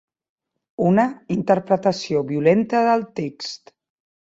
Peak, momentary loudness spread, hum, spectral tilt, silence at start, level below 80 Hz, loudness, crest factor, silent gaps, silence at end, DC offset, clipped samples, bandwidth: -4 dBFS; 14 LU; none; -6.5 dB/octave; 0.8 s; -62 dBFS; -20 LUFS; 18 dB; none; 0.7 s; under 0.1%; under 0.1%; 8 kHz